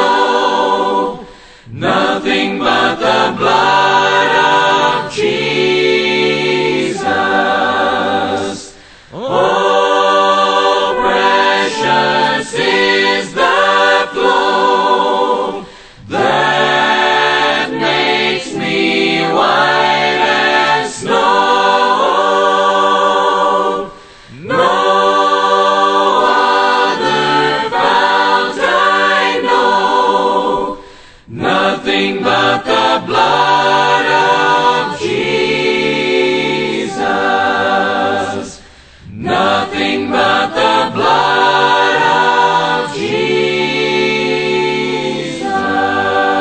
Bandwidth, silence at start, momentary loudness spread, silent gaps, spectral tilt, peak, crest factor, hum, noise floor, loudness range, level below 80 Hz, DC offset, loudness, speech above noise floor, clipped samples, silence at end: 9.2 kHz; 0 s; 6 LU; none; -3.5 dB/octave; 0 dBFS; 12 dB; none; -39 dBFS; 3 LU; -50 dBFS; under 0.1%; -12 LUFS; 27 dB; under 0.1%; 0 s